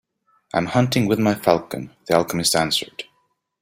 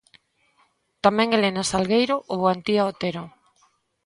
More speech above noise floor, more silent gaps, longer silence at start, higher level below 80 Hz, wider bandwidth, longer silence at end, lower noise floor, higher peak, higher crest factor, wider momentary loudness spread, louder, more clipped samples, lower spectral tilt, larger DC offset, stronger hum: first, 48 dB vs 43 dB; neither; second, 0.55 s vs 1.05 s; about the same, -54 dBFS vs -58 dBFS; first, 16 kHz vs 11.5 kHz; second, 0.6 s vs 0.75 s; about the same, -68 dBFS vs -65 dBFS; about the same, 0 dBFS vs -2 dBFS; about the same, 20 dB vs 22 dB; first, 14 LU vs 9 LU; about the same, -20 LUFS vs -22 LUFS; neither; about the same, -4.5 dB/octave vs -4.5 dB/octave; neither; neither